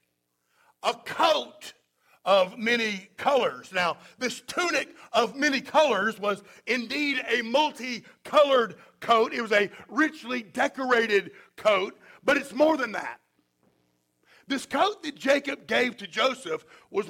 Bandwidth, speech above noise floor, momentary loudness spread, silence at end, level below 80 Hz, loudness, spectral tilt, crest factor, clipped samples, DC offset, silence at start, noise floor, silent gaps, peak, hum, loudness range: 16.5 kHz; 50 dB; 11 LU; 0 s; -72 dBFS; -26 LUFS; -3 dB/octave; 18 dB; under 0.1%; under 0.1%; 0.85 s; -76 dBFS; none; -8 dBFS; none; 3 LU